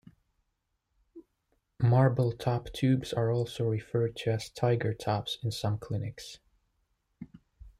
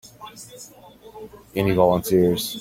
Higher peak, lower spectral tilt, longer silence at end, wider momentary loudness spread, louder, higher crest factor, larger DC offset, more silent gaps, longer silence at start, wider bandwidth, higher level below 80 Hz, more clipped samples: second, -12 dBFS vs -4 dBFS; first, -7 dB/octave vs -5.5 dB/octave; about the same, 0.1 s vs 0 s; second, 19 LU vs 23 LU; second, -30 LUFS vs -20 LUFS; about the same, 18 dB vs 20 dB; neither; neither; first, 1.15 s vs 0.2 s; second, 13 kHz vs 16.5 kHz; second, -58 dBFS vs -50 dBFS; neither